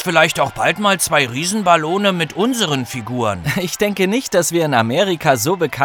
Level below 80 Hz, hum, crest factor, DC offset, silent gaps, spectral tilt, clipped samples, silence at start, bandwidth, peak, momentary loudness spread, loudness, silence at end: -50 dBFS; none; 16 dB; under 0.1%; none; -4 dB/octave; under 0.1%; 0 s; over 20 kHz; 0 dBFS; 6 LU; -16 LUFS; 0 s